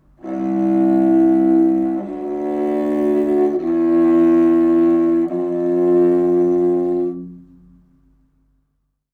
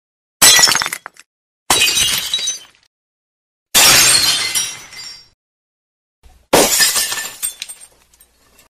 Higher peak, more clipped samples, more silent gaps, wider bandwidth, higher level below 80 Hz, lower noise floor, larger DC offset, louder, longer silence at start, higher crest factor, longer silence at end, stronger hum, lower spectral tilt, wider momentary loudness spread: second, -6 dBFS vs 0 dBFS; neither; second, none vs 1.26-1.66 s, 2.87-3.66 s, 5.34-6.22 s; second, 3.3 kHz vs 16 kHz; second, -54 dBFS vs -46 dBFS; first, -69 dBFS vs -52 dBFS; neither; second, -16 LUFS vs -11 LUFS; second, 0.25 s vs 0.4 s; about the same, 12 dB vs 16 dB; first, 1.75 s vs 1.05 s; first, 50 Hz at -60 dBFS vs none; first, -10 dB/octave vs 0.5 dB/octave; second, 10 LU vs 23 LU